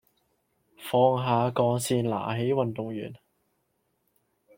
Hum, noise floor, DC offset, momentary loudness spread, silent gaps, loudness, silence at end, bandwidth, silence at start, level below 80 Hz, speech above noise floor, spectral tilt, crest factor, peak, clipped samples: none; -75 dBFS; under 0.1%; 13 LU; none; -26 LUFS; 1.4 s; 16.5 kHz; 0.8 s; -68 dBFS; 49 dB; -6 dB/octave; 20 dB; -10 dBFS; under 0.1%